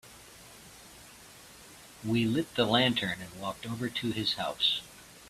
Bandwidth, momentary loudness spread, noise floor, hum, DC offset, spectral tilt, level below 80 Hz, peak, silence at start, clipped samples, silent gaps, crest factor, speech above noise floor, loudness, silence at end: 15 kHz; 24 LU; -52 dBFS; none; under 0.1%; -4.5 dB/octave; -62 dBFS; -12 dBFS; 0.05 s; under 0.1%; none; 22 dB; 22 dB; -30 LUFS; 0 s